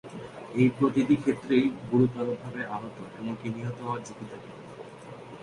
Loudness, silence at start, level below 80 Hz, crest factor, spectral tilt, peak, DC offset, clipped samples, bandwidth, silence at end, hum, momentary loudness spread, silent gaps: -28 LUFS; 0.05 s; -62 dBFS; 18 dB; -7.5 dB/octave; -10 dBFS; under 0.1%; under 0.1%; 11 kHz; 0 s; none; 20 LU; none